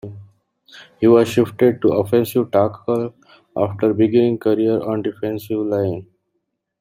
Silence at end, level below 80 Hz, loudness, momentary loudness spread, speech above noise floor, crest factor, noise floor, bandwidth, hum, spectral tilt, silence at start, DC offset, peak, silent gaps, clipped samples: 0.75 s; -58 dBFS; -18 LUFS; 10 LU; 56 dB; 16 dB; -74 dBFS; 16 kHz; none; -7.5 dB/octave; 0.05 s; under 0.1%; -2 dBFS; none; under 0.1%